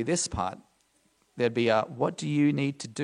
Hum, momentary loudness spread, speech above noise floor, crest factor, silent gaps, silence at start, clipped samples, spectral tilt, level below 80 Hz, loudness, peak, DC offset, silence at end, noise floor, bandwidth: none; 7 LU; 41 dB; 20 dB; none; 0 s; under 0.1%; -5 dB/octave; -54 dBFS; -28 LUFS; -10 dBFS; under 0.1%; 0 s; -68 dBFS; 11 kHz